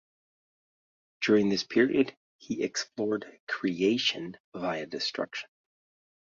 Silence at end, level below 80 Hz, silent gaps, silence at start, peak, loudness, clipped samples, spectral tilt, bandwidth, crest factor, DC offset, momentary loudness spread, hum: 0.95 s; -70 dBFS; 2.17-2.39 s, 3.40-3.47 s, 4.40-4.52 s; 1.2 s; -12 dBFS; -29 LUFS; under 0.1%; -4 dB/octave; 7.6 kHz; 20 dB; under 0.1%; 12 LU; none